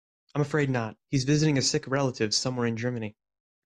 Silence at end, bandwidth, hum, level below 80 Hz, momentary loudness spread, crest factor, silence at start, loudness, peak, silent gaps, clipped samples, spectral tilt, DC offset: 0.55 s; 11 kHz; none; -60 dBFS; 8 LU; 16 dB; 0.35 s; -27 LUFS; -12 dBFS; none; under 0.1%; -4.5 dB/octave; under 0.1%